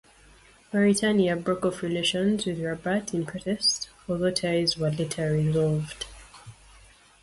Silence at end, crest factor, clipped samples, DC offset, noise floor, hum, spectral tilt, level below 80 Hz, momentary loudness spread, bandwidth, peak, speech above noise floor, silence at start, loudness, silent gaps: 0.7 s; 16 dB; under 0.1%; under 0.1%; -55 dBFS; none; -5 dB/octave; -54 dBFS; 8 LU; 11.5 kHz; -10 dBFS; 29 dB; 0.7 s; -26 LUFS; none